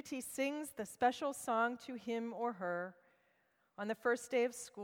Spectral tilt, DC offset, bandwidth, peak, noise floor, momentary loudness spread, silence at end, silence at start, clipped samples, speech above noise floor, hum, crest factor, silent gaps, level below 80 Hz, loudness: -3.5 dB/octave; under 0.1%; 18.5 kHz; -20 dBFS; -77 dBFS; 10 LU; 0 s; 0.05 s; under 0.1%; 38 dB; none; 20 dB; none; -82 dBFS; -39 LUFS